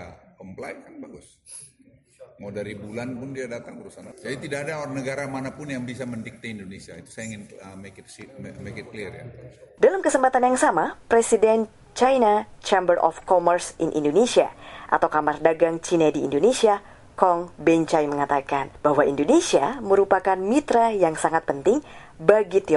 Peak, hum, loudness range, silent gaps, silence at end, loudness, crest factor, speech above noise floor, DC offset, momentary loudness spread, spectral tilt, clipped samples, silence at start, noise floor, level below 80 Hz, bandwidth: 0 dBFS; none; 16 LU; none; 0 s; -22 LUFS; 22 dB; 35 dB; under 0.1%; 22 LU; -4.5 dB/octave; under 0.1%; 0 s; -57 dBFS; -56 dBFS; 11.5 kHz